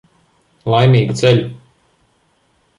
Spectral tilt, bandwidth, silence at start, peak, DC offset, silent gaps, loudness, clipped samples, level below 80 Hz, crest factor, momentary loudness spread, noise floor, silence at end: -6.5 dB/octave; 10.5 kHz; 0.65 s; -2 dBFS; under 0.1%; none; -13 LUFS; under 0.1%; -50 dBFS; 16 dB; 15 LU; -59 dBFS; 1.2 s